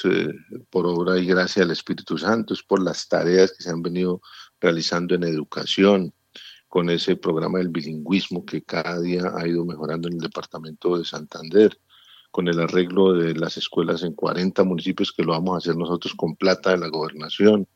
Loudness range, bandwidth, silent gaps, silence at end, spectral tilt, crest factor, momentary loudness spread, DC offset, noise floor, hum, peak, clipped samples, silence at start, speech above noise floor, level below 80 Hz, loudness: 4 LU; 8.2 kHz; none; 0.1 s; -6 dB/octave; 20 dB; 10 LU; under 0.1%; -46 dBFS; none; -2 dBFS; under 0.1%; 0 s; 24 dB; -68 dBFS; -22 LUFS